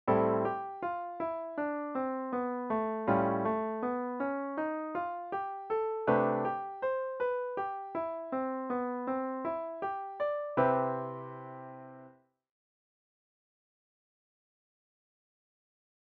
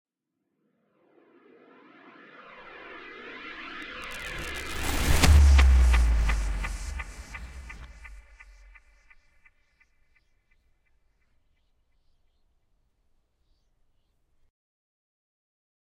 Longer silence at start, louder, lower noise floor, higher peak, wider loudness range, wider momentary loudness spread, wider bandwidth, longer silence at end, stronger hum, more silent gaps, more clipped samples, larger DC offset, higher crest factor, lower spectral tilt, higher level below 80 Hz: second, 0.05 s vs 2.8 s; second, -34 LUFS vs -25 LUFS; second, -60 dBFS vs -81 dBFS; second, -14 dBFS vs -4 dBFS; second, 3 LU vs 22 LU; second, 9 LU vs 26 LU; second, 4.6 kHz vs 16.5 kHz; second, 3.9 s vs 7.9 s; neither; neither; neither; neither; second, 20 dB vs 26 dB; first, -6.5 dB/octave vs -4.5 dB/octave; second, -72 dBFS vs -30 dBFS